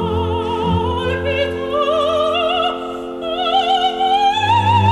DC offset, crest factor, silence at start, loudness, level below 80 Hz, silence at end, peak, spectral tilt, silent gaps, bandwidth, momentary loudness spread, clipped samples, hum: under 0.1%; 14 dB; 0 s; -17 LUFS; -38 dBFS; 0 s; -2 dBFS; -6 dB/octave; none; 12 kHz; 6 LU; under 0.1%; none